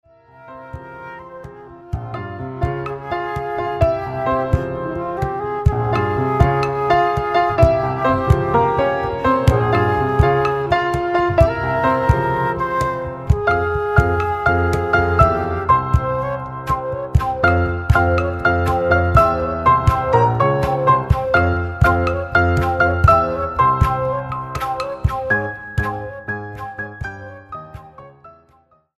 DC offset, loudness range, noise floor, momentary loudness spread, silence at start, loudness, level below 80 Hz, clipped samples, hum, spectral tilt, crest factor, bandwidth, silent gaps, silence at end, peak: under 0.1%; 8 LU; -56 dBFS; 14 LU; 0.4 s; -18 LUFS; -28 dBFS; under 0.1%; none; -7.5 dB/octave; 18 dB; 13 kHz; none; 0.65 s; 0 dBFS